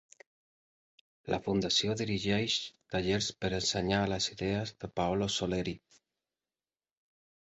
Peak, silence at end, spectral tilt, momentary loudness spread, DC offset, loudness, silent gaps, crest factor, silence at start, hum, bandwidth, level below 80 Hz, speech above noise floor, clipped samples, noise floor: -14 dBFS; 1.65 s; -4 dB/octave; 8 LU; under 0.1%; -32 LUFS; none; 20 dB; 1.25 s; none; 8.2 kHz; -56 dBFS; over 58 dB; under 0.1%; under -90 dBFS